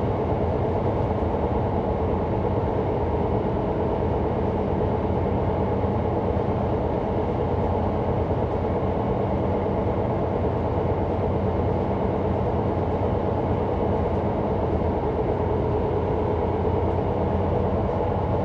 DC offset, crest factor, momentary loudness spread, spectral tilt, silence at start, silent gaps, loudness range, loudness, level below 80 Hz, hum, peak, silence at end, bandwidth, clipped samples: under 0.1%; 12 dB; 1 LU; -10 dB/octave; 0 s; none; 0 LU; -24 LUFS; -34 dBFS; none; -10 dBFS; 0 s; 5.8 kHz; under 0.1%